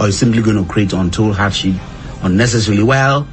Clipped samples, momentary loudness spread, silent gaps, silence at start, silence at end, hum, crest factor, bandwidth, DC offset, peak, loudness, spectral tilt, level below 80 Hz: under 0.1%; 7 LU; none; 0 s; 0 s; none; 12 dB; 8.8 kHz; under 0.1%; -2 dBFS; -14 LUFS; -5.5 dB/octave; -32 dBFS